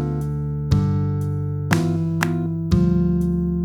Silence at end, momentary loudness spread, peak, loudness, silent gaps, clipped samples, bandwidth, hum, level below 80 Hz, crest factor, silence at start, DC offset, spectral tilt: 0 s; 6 LU; 0 dBFS; -21 LUFS; none; under 0.1%; 14.5 kHz; none; -34 dBFS; 20 dB; 0 s; under 0.1%; -7.5 dB/octave